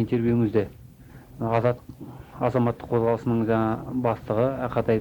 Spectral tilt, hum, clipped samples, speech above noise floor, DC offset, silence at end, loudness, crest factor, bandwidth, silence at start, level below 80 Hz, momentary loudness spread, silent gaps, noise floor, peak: -9.5 dB/octave; none; under 0.1%; 22 dB; under 0.1%; 0 s; -25 LUFS; 16 dB; 19.5 kHz; 0 s; -50 dBFS; 11 LU; none; -47 dBFS; -8 dBFS